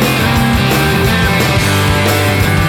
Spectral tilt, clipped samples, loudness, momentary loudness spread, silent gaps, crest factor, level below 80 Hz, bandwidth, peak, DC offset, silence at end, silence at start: -5 dB/octave; under 0.1%; -11 LUFS; 0 LU; none; 10 dB; -24 dBFS; 19 kHz; -2 dBFS; under 0.1%; 0 s; 0 s